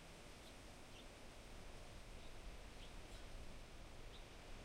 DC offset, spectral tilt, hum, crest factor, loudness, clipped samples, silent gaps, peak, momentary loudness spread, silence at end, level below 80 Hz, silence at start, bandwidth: under 0.1%; -4 dB/octave; none; 12 dB; -59 LUFS; under 0.1%; none; -42 dBFS; 1 LU; 0 s; -58 dBFS; 0 s; 16 kHz